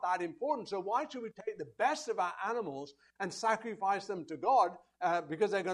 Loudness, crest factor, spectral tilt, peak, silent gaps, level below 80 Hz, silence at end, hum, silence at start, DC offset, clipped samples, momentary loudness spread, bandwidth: -35 LUFS; 18 dB; -4 dB/octave; -16 dBFS; none; -82 dBFS; 0 s; none; 0 s; under 0.1%; under 0.1%; 12 LU; 11.5 kHz